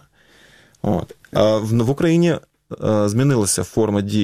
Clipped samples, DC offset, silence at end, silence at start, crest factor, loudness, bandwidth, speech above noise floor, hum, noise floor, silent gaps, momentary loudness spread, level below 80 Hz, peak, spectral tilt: under 0.1%; 0.3%; 0 s; 0.85 s; 18 dB; -19 LUFS; 16 kHz; 34 dB; none; -52 dBFS; none; 9 LU; -48 dBFS; -2 dBFS; -6 dB/octave